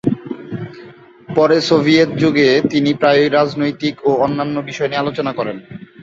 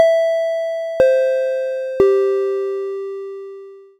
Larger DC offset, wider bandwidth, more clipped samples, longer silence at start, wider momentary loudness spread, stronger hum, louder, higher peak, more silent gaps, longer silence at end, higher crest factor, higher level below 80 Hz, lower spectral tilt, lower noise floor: neither; second, 7.8 kHz vs 10.5 kHz; neither; about the same, 0.05 s vs 0 s; about the same, 15 LU vs 16 LU; neither; first, -15 LUFS vs -18 LUFS; about the same, 0 dBFS vs 0 dBFS; neither; second, 0 s vs 0.15 s; about the same, 16 dB vs 18 dB; about the same, -54 dBFS vs -52 dBFS; about the same, -6 dB/octave vs -5 dB/octave; about the same, -40 dBFS vs -37 dBFS